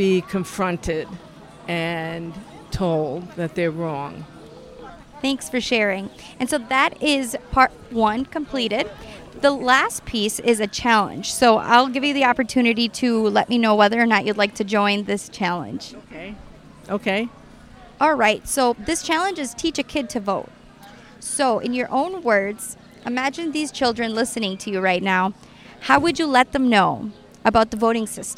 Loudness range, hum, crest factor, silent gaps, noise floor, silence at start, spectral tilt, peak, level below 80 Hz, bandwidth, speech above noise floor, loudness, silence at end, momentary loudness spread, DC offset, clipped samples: 8 LU; none; 20 dB; none; -45 dBFS; 0 s; -4 dB/octave; 0 dBFS; -48 dBFS; 16 kHz; 24 dB; -20 LUFS; 0.05 s; 16 LU; under 0.1%; under 0.1%